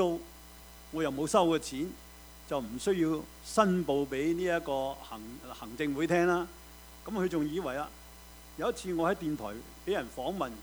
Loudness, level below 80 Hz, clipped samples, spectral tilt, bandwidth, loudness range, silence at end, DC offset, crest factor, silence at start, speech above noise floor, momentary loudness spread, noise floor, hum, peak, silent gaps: -32 LUFS; -54 dBFS; under 0.1%; -5.5 dB/octave; over 20 kHz; 4 LU; 0 s; under 0.1%; 22 dB; 0 s; 20 dB; 22 LU; -51 dBFS; none; -10 dBFS; none